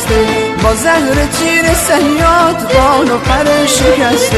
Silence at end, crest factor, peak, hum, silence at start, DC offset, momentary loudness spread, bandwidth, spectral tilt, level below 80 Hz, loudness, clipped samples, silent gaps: 0 s; 10 dB; 0 dBFS; none; 0 s; 0.3%; 3 LU; 14 kHz; -4 dB/octave; -22 dBFS; -10 LUFS; under 0.1%; none